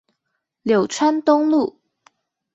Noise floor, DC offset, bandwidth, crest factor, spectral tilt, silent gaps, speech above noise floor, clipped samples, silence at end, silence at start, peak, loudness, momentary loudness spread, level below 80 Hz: -76 dBFS; under 0.1%; 8.2 kHz; 18 dB; -5 dB/octave; none; 59 dB; under 0.1%; 0.85 s; 0.65 s; -4 dBFS; -19 LUFS; 9 LU; -66 dBFS